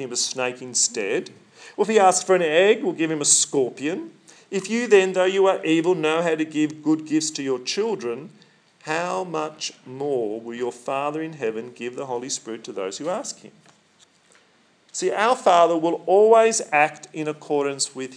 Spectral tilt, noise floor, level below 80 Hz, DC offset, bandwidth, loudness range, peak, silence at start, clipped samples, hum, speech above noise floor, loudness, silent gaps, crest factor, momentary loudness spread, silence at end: -3 dB/octave; -59 dBFS; under -90 dBFS; under 0.1%; 10.5 kHz; 10 LU; -4 dBFS; 0 s; under 0.1%; none; 38 dB; -22 LUFS; none; 18 dB; 14 LU; 0 s